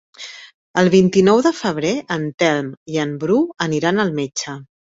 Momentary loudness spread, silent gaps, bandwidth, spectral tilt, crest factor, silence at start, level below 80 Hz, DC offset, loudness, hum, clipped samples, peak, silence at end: 13 LU; 0.54-0.74 s, 2.34-2.38 s, 2.77-2.86 s; 8 kHz; -5.5 dB/octave; 16 dB; 0.2 s; -58 dBFS; under 0.1%; -18 LUFS; none; under 0.1%; -2 dBFS; 0.2 s